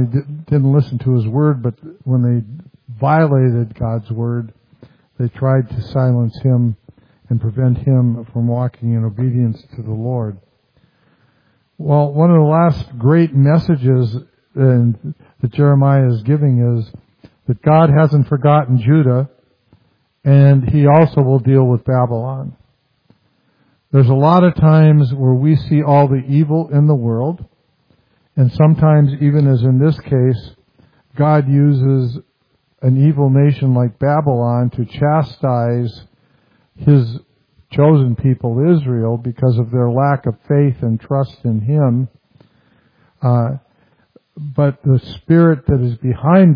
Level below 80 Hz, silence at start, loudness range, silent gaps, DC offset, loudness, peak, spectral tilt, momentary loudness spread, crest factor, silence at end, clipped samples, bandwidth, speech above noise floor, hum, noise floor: -44 dBFS; 0 s; 5 LU; none; under 0.1%; -14 LUFS; 0 dBFS; -12 dB/octave; 12 LU; 14 dB; 0 s; under 0.1%; 5.2 kHz; 49 dB; none; -62 dBFS